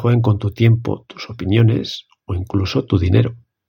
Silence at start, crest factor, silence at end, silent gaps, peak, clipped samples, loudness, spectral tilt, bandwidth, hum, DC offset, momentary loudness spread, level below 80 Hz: 0 s; 16 dB; 0.35 s; none; 0 dBFS; under 0.1%; -18 LUFS; -8 dB/octave; 6.8 kHz; none; under 0.1%; 13 LU; -40 dBFS